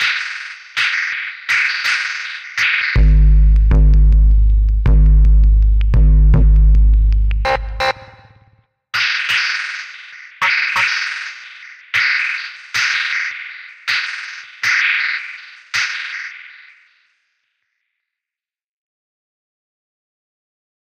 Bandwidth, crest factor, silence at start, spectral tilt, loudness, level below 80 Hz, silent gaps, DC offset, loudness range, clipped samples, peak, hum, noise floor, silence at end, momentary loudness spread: 7 kHz; 12 dB; 0 s; -4.5 dB/octave; -15 LUFS; -16 dBFS; none; under 0.1%; 7 LU; under 0.1%; -4 dBFS; none; -89 dBFS; 4.5 s; 15 LU